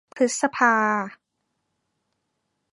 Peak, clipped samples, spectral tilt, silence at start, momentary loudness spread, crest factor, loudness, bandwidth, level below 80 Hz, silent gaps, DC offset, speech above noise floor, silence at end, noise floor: -4 dBFS; under 0.1%; -3.5 dB/octave; 0.15 s; 9 LU; 22 dB; -21 LUFS; 11 kHz; -76 dBFS; none; under 0.1%; 55 dB; 1.6 s; -77 dBFS